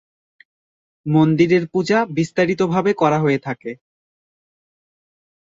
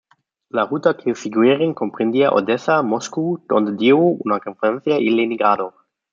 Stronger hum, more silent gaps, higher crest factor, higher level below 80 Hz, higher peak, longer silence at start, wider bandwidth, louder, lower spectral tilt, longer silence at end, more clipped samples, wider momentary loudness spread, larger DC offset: neither; neither; about the same, 18 dB vs 18 dB; first, -60 dBFS vs -68 dBFS; about the same, -2 dBFS vs 0 dBFS; first, 1.05 s vs 0.55 s; about the same, 7.8 kHz vs 7.6 kHz; about the same, -18 LUFS vs -18 LUFS; about the same, -7 dB/octave vs -6 dB/octave; first, 1.7 s vs 0.45 s; neither; first, 15 LU vs 7 LU; neither